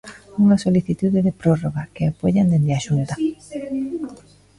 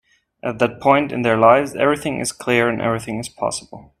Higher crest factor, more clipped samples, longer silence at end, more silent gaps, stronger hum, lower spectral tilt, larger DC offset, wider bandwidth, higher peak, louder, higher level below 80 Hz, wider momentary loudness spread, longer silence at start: about the same, 16 dB vs 18 dB; neither; first, 0.4 s vs 0.2 s; neither; neither; first, -8 dB/octave vs -5 dB/octave; neither; second, 11.5 kHz vs 15 kHz; second, -4 dBFS vs 0 dBFS; about the same, -20 LUFS vs -18 LUFS; first, -48 dBFS vs -54 dBFS; about the same, 11 LU vs 13 LU; second, 0.05 s vs 0.45 s